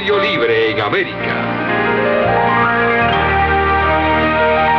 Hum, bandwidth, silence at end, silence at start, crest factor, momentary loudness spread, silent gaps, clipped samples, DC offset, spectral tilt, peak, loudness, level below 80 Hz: none; 6.4 kHz; 0 s; 0 s; 12 dB; 4 LU; none; under 0.1%; under 0.1%; -7.5 dB/octave; -2 dBFS; -14 LUFS; -32 dBFS